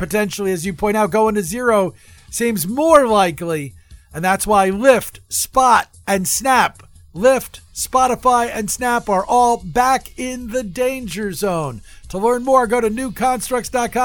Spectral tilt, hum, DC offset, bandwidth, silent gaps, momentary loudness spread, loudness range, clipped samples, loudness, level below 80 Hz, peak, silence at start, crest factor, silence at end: -4 dB/octave; none; under 0.1%; 19.5 kHz; none; 11 LU; 3 LU; under 0.1%; -17 LUFS; -42 dBFS; 0 dBFS; 0 s; 18 dB; 0 s